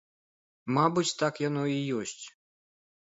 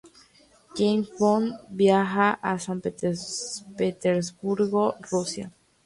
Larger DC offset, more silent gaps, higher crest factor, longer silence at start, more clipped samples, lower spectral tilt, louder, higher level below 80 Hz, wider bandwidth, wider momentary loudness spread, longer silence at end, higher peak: neither; neither; about the same, 20 dB vs 18 dB; first, 0.65 s vs 0.05 s; neither; about the same, -5 dB/octave vs -5 dB/octave; second, -29 LUFS vs -25 LUFS; second, -74 dBFS vs -64 dBFS; second, 8 kHz vs 11.5 kHz; first, 18 LU vs 11 LU; first, 0.8 s vs 0.35 s; about the same, -10 dBFS vs -8 dBFS